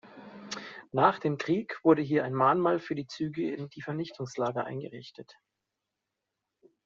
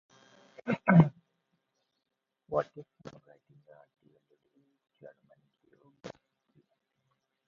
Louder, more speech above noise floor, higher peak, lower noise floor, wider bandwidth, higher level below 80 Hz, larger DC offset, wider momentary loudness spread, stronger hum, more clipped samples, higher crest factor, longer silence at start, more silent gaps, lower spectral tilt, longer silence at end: about the same, -29 LUFS vs -28 LUFS; about the same, 57 dB vs 55 dB; about the same, -8 dBFS vs -8 dBFS; first, -86 dBFS vs -81 dBFS; first, 7.6 kHz vs 6.4 kHz; second, -74 dBFS vs -68 dBFS; neither; second, 16 LU vs 28 LU; neither; neither; about the same, 22 dB vs 26 dB; second, 0.05 s vs 0.65 s; neither; second, -5.5 dB/octave vs -8.5 dB/octave; first, 1.65 s vs 1.4 s